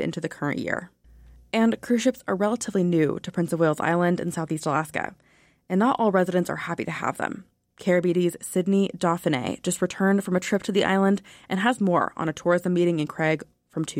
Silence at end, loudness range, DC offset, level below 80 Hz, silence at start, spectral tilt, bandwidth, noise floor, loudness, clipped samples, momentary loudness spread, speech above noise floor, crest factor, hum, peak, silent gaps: 0 s; 2 LU; under 0.1%; -62 dBFS; 0 s; -6 dB/octave; 16.5 kHz; -51 dBFS; -24 LUFS; under 0.1%; 8 LU; 27 dB; 16 dB; none; -10 dBFS; none